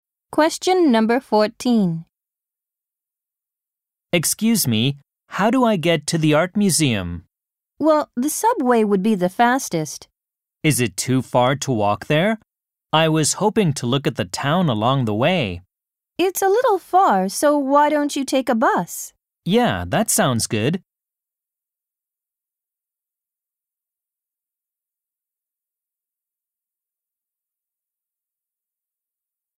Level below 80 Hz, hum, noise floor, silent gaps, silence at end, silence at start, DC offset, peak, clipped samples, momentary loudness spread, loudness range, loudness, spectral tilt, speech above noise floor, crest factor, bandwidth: -56 dBFS; none; -88 dBFS; none; 8.8 s; 0.3 s; under 0.1%; -2 dBFS; under 0.1%; 9 LU; 5 LU; -19 LUFS; -4.5 dB/octave; 70 dB; 18 dB; 16 kHz